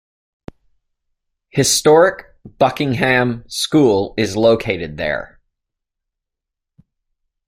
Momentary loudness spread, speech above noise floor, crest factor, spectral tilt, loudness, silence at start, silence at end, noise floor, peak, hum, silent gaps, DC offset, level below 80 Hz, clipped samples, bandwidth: 11 LU; 66 dB; 18 dB; -4 dB/octave; -16 LUFS; 1.55 s; 2.25 s; -82 dBFS; -2 dBFS; none; none; under 0.1%; -48 dBFS; under 0.1%; 16 kHz